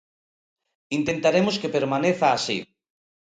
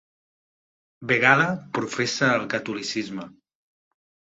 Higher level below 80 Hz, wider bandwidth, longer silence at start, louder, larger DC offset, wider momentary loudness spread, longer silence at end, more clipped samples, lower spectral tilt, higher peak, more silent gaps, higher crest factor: first, -62 dBFS vs -68 dBFS; first, 9.4 kHz vs 8.2 kHz; about the same, 0.9 s vs 1 s; about the same, -23 LUFS vs -22 LUFS; neither; second, 8 LU vs 15 LU; second, 0.6 s vs 1.05 s; neither; about the same, -5 dB/octave vs -4 dB/octave; second, -6 dBFS vs -2 dBFS; neither; second, 18 dB vs 24 dB